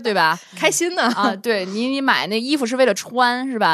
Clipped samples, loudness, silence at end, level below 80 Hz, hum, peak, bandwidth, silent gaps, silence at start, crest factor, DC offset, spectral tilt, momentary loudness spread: under 0.1%; -19 LUFS; 0 s; -76 dBFS; none; -2 dBFS; 14 kHz; none; 0 s; 18 dB; under 0.1%; -3 dB/octave; 3 LU